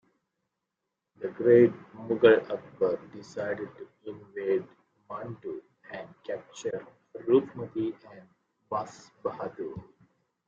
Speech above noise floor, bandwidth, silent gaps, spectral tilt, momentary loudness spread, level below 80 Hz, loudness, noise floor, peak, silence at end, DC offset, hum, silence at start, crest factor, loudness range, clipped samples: 57 dB; 7.4 kHz; none; -7 dB/octave; 22 LU; -70 dBFS; -28 LUFS; -85 dBFS; -8 dBFS; 0.65 s; under 0.1%; none; 1.2 s; 22 dB; 11 LU; under 0.1%